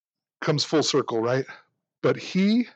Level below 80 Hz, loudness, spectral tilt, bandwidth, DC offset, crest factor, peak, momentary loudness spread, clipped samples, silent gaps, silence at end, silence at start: -78 dBFS; -24 LUFS; -5 dB/octave; 8.8 kHz; under 0.1%; 14 dB; -10 dBFS; 6 LU; under 0.1%; none; 0.05 s; 0.4 s